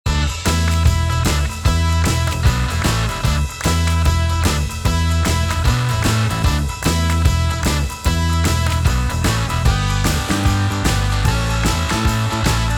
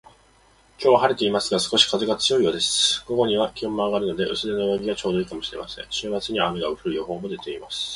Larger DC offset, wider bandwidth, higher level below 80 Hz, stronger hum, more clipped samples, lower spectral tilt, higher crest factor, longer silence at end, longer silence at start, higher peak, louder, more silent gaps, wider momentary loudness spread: neither; first, 19 kHz vs 11.5 kHz; first, -22 dBFS vs -54 dBFS; neither; neither; first, -4.5 dB/octave vs -3 dB/octave; about the same, 16 dB vs 20 dB; about the same, 0 s vs 0 s; second, 0.05 s vs 0.8 s; about the same, -2 dBFS vs -2 dBFS; first, -18 LUFS vs -22 LUFS; neither; second, 2 LU vs 12 LU